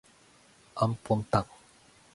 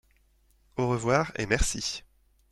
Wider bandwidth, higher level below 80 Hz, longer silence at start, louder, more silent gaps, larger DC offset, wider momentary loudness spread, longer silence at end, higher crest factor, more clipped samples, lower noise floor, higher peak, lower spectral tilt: second, 11.5 kHz vs 13 kHz; second, -56 dBFS vs -38 dBFS; about the same, 0.75 s vs 0.75 s; about the same, -30 LUFS vs -28 LUFS; neither; neither; first, 17 LU vs 11 LU; first, 0.7 s vs 0.5 s; about the same, 22 dB vs 20 dB; neither; second, -60 dBFS vs -65 dBFS; about the same, -10 dBFS vs -10 dBFS; first, -7 dB/octave vs -4 dB/octave